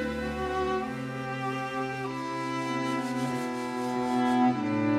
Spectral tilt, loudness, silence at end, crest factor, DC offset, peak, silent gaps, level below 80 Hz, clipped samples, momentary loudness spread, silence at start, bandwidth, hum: -6 dB/octave; -30 LUFS; 0 s; 14 dB; under 0.1%; -14 dBFS; none; -52 dBFS; under 0.1%; 8 LU; 0 s; 14 kHz; none